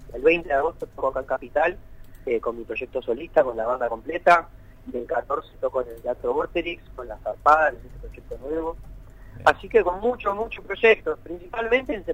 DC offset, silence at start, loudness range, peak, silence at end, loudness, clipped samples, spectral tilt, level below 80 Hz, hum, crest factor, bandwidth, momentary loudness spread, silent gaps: under 0.1%; 0 s; 3 LU; -4 dBFS; 0 s; -24 LUFS; under 0.1%; -5.5 dB/octave; -44 dBFS; none; 20 dB; 15 kHz; 16 LU; none